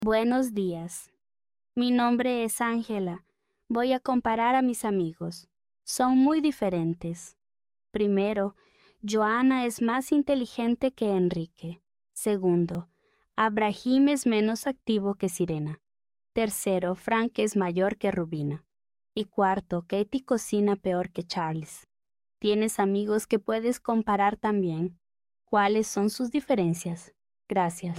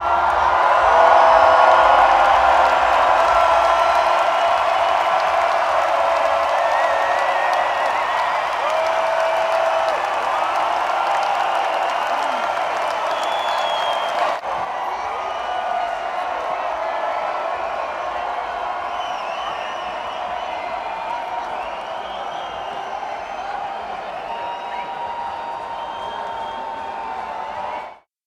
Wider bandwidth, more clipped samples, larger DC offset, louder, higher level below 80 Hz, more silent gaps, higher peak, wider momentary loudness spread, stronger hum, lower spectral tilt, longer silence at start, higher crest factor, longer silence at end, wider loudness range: first, 16 kHz vs 14 kHz; neither; neither; second, -27 LUFS vs -19 LUFS; second, -62 dBFS vs -50 dBFS; neither; second, -10 dBFS vs 0 dBFS; about the same, 13 LU vs 14 LU; neither; first, -5.5 dB/octave vs -2.5 dB/octave; about the same, 0 s vs 0 s; about the same, 18 dB vs 18 dB; second, 0 s vs 0.3 s; second, 2 LU vs 14 LU